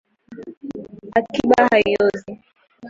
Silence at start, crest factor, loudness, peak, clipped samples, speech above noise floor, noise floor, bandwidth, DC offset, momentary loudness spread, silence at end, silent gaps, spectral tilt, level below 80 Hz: 0.3 s; 18 dB; -17 LUFS; -2 dBFS; under 0.1%; 21 dB; -38 dBFS; 7.8 kHz; under 0.1%; 23 LU; 0 s; 0.57-0.61 s; -5.5 dB/octave; -54 dBFS